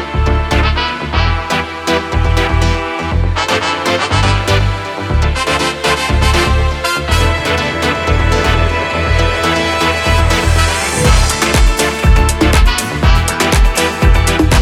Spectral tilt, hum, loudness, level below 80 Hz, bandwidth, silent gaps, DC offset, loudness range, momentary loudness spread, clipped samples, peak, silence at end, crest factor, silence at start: -4.5 dB/octave; none; -13 LUFS; -16 dBFS; 15.5 kHz; none; under 0.1%; 3 LU; 4 LU; under 0.1%; 0 dBFS; 0 s; 12 dB; 0 s